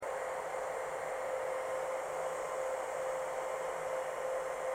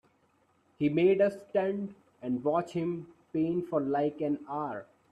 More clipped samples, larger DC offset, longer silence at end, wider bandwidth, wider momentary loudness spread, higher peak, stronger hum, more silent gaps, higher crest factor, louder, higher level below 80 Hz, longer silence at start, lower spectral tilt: neither; neither; second, 0 s vs 0.3 s; first, 17 kHz vs 9.6 kHz; second, 1 LU vs 13 LU; second, -26 dBFS vs -14 dBFS; neither; neither; about the same, 12 dB vs 16 dB; second, -38 LUFS vs -31 LUFS; about the same, -70 dBFS vs -72 dBFS; second, 0 s vs 0.8 s; second, -2.5 dB/octave vs -8.5 dB/octave